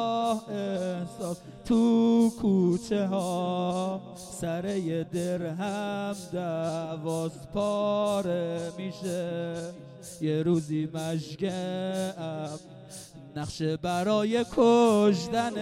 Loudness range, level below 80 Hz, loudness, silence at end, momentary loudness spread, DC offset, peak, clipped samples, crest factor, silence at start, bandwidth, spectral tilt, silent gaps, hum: 5 LU; -60 dBFS; -28 LUFS; 0 s; 14 LU; under 0.1%; -10 dBFS; under 0.1%; 18 dB; 0 s; 15 kHz; -6.5 dB/octave; none; none